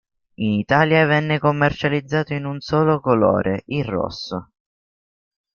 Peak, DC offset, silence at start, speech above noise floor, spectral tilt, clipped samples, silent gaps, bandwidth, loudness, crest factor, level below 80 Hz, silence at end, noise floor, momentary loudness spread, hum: -2 dBFS; under 0.1%; 0.4 s; over 71 dB; -7.5 dB/octave; under 0.1%; none; 7 kHz; -19 LUFS; 18 dB; -50 dBFS; 1.1 s; under -90 dBFS; 10 LU; none